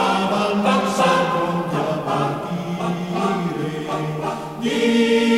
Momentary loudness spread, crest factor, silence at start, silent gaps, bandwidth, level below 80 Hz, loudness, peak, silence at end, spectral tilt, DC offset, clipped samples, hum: 8 LU; 16 dB; 0 s; none; 15.5 kHz; -54 dBFS; -21 LUFS; -4 dBFS; 0 s; -5.5 dB/octave; under 0.1%; under 0.1%; none